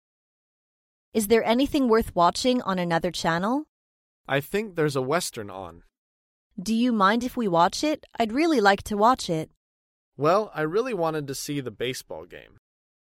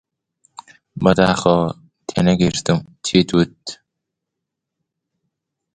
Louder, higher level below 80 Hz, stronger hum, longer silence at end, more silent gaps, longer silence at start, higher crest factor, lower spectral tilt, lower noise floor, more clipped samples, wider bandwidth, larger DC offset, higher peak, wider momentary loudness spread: second, -24 LUFS vs -17 LUFS; second, -54 dBFS vs -46 dBFS; neither; second, 0.7 s vs 2 s; first, 3.69-4.24 s, 5.98-6.51 s, 9.56-10.12 s vs none; first, 1.15 s vs 0.95 s; about the same, 22 dB vs 20 dB; about the same, -4.5 dB/octave vs -5.5 dB/octave; first, under -90 dBFS vs -81 dBFS; neither; first, 16 kHz vs 9.6 kHz; neither; second, -4 dBFS vs 0 dBFS; second, 11 LU vs 18 LU